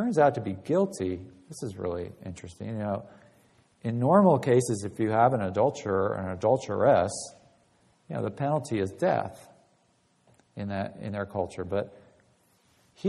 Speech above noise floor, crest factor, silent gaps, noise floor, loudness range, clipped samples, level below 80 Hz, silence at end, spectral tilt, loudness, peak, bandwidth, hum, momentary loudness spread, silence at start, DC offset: 41 dB; 22 dB; none; -68 dBFS; 11 LU; under 0.1%; -62 dBFS; 0 s; -6.5 dB/octave; -27 LUFS; -6 dBFS; 12.5 kHz; none; 16 LU; 0 s; under 0.1%